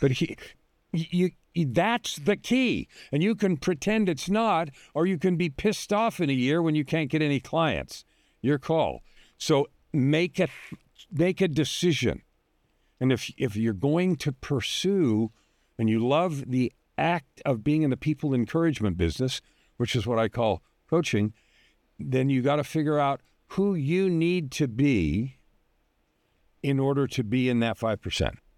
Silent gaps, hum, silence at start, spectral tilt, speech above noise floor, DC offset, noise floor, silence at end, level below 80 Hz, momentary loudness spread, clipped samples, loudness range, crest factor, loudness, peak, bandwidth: none; none; 0 s; -6 dB/octave; 45 dB; under 0.1%; -70 dBFS; 0.25 s; -52 dBFS; 8 LU; under 0.1%; 2 LU; 16 dB; -26 LUFS; -10 dBFS; 15.5 kHz